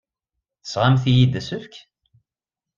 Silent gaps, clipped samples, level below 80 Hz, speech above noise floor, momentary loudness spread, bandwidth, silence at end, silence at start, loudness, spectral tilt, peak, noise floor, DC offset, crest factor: none; under 0.1%; -52 dBFS; 70 dB; 16 LU; 7.4 kHz; 1 s; 0.65 s; -19 LUFS; -7 dB/octave; -4 dBFS; -89 dBFS; under 0.1%; 18 dB